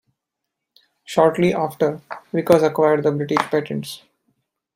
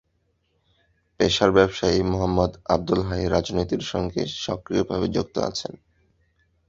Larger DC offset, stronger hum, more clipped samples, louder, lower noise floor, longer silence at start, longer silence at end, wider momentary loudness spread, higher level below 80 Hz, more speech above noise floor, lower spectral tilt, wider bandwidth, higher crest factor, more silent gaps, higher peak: neither; neither; neither; first, -19 LUFS vs -23 LUFS; first, -81 dBFS vs -70 dBFS; about the same, 1.1 s vs 1.2 s; second, 0.8 s vs 0.95 s; first, 13 LU vs 9 LU; second, -62 dBFS vs -42 dBFS; first, 63 dB vs 47 dB; about the same, -6.5 dB/octave vs -5.5 dB/octave; first, 16 kHz vs 7.8 kHz; about the same, 20 dB vs 22 dB; neither; about the same, 0 dBFS vs -2 dBFS